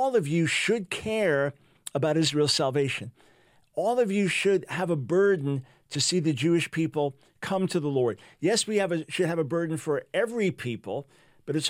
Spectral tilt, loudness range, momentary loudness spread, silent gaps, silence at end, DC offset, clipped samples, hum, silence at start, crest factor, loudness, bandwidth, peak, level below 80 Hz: -4.5 dB/octave; 2 LU; 11 LU; none; 0 s; under 0.1%; under 0.1%; none; 0 s; 16 dB; -27 LUFS; 16 kHz; -10 dBFS; -68 dBFS